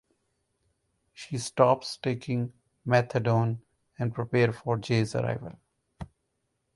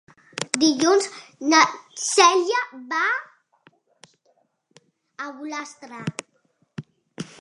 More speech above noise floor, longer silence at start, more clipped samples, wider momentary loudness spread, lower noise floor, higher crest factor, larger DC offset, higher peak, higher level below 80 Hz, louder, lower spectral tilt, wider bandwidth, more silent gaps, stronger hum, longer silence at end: first, 51 dB vs 45 dB; first, 1.2 s vs 0.35 s; neither; about the same, 22 LU vs 22 LU; first, -78 dBFS vs -67 dBFS; about the same, 24 dB vs 24 dB; neither; second, -6 dBFS vs 0 dBFS; first, -60 dBFS vs -74 dBFS; second, -28 LUFS vs -21 LUFS; first, -6.5 dB/octave vs -2.5 dB/octave; about the same, 11.5 kHz vs 11.5 kHz; neither; neither; first, 0.7 s vs 0.2 s